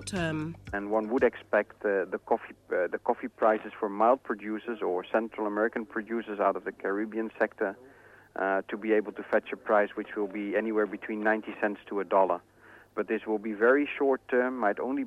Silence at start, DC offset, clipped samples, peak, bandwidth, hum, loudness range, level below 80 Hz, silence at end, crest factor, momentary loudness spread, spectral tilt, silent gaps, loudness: 0 s; under 0.1%; under 0.1%; -12 dBFS; 12 kHz; none; 3 LU; -64 dBFS; 0 s; 18 dB; 8 LU; -6 dB/octave; none; -29 LUFS